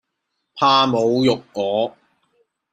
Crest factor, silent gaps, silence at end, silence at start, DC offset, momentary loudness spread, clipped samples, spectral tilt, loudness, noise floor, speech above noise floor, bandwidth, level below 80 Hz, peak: 18 dB; none; 0.8 s; 0.55 s; under 0.1%; 8 LU; under 0.1%; -5.5 dB/octave; -18 LUFS; -76 dBFS; 58 dB; 9.2 kHz; -60 dBFS; -2 dBFS